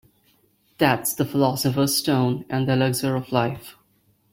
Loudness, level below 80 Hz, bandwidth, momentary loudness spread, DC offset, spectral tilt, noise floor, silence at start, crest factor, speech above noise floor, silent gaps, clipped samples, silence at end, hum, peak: -22 LUFS; -58 dBFS; 16.5 kHz; 4 LU; under 0.1%; -5 dB/octave; -63 dBFS; 0.8 s; 20 dB; 42 dB; none; under 0.1%; 0.6 s; none; -4 dBFS